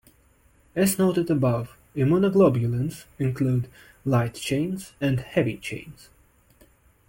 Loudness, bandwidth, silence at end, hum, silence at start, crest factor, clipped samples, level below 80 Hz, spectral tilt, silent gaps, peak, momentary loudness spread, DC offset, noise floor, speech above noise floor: -24 LUFS; 17 kHz; 1.15 s; none; 0.75 s; 18 dB; under 0.1%; -54 dBFS; -6.5 dB/octave; none; -8 dBFS; 14 LU; under 0.1%; -59 dBFS; 36 dB